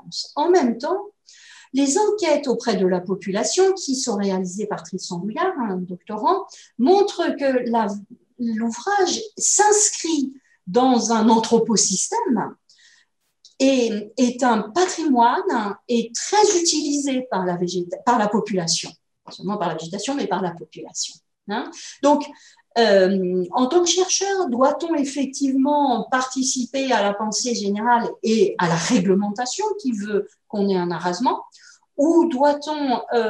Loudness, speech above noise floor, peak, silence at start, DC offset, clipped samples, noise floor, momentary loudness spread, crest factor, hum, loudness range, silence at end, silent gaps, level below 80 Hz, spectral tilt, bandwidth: -20 LUFS; 42 dB; -4 dBFS; 0.05 s; under 0.1%; under 0.1%; -62 dBFS; 11 LU; 16 dB; none; 4 LU; 0 s; none; -70 dBFS; -3.5 dB/octave; 12 kHz